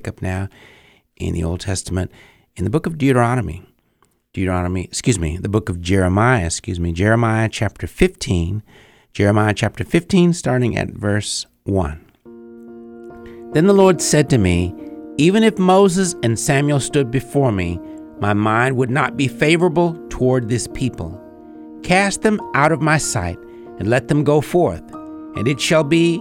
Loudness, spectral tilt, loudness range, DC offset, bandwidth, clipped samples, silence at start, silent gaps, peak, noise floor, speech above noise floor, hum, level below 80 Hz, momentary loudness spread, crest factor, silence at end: -17 LUFS; -5.5 dB/octave; 5 LU; under 0.1%; 16.5 kHz; under 0.1%; 0 s; none; 0 dBFS; -61 dBFS; 44 dB; none; -38 dBFS; 16 LU; 16 dB; 0 s